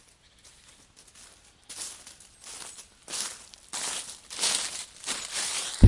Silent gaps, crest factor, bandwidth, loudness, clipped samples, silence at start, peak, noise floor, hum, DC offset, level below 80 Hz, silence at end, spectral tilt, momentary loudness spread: none; 26 dB; 11.5 kHz; -32 LUFS; under 0.1%; 0.45 s; -2 dBFS; -57 dBFS; none; under 0.1%; -56 dBFS; 0 s; -3.5 dB/octave; 25 LU